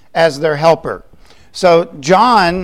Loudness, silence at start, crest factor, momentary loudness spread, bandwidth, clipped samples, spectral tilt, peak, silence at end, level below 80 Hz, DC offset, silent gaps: -12 LUFS; 0.15 s; 12 dB; 16 LU; 15.5 kHz; under 0.1%; -5 dB/octave; 0 dBFS; 0 s; -44 dBFS; 0.7%; none